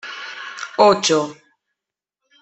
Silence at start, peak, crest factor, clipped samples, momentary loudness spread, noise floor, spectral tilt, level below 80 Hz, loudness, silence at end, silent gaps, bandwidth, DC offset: 0.05 s; -2 dBFS; 20 dB; under 0.1%; 17 LU; -85 dBFS; -3 dB/octave; -64 dBFS; -16 LUFS; 1.1 s; none; 8.4 kHz; under 0.1%